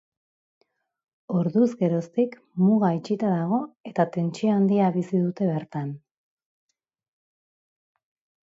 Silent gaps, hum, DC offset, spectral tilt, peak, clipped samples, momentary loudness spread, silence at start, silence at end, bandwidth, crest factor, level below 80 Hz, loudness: 3.80-3.84 s; none; under 0.1%; -9 dB/octave; -6 dBFS; under 0.1%; 9 LU; 1.3 s; 2.45 s; 7.8 kHz; 18 dB; -72 dBFS; -24 LUFS